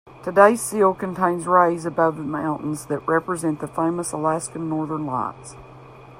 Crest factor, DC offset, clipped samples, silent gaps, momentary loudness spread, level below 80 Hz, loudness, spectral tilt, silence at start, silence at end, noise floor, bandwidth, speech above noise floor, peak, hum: 20 dB; under 0.1%; under 0.1%; none; 11 LU; -58 dBFS; -21 LUFS; -6 dB/octave; 0.05 s; 0 s; -43 dBFS; 16 kHz; 22 dB; -2 dBFS; none